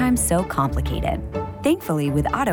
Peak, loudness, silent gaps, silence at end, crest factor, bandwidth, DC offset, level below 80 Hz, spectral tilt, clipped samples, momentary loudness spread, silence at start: -8 dBFS; -22 LUFS; none; 0 s; 12 dB; over 20 kHz; under 0.1%; -32 dBFS; -5.5 dB/octave; under 0.1%; 6 LU; 0 s